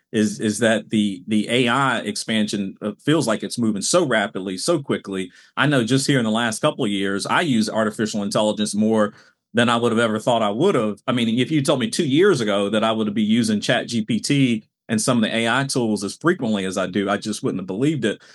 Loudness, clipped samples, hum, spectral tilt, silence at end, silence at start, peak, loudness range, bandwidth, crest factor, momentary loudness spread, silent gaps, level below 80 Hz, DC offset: -20 LUFS; under 0.1%; none; -4.5 dB/octave; 0.2 s; 0.15 s; -2 dBFS; 2 LU; 13.5 kHz; 18 dB; 6 LU; none; -74 dBFS; under 0.1%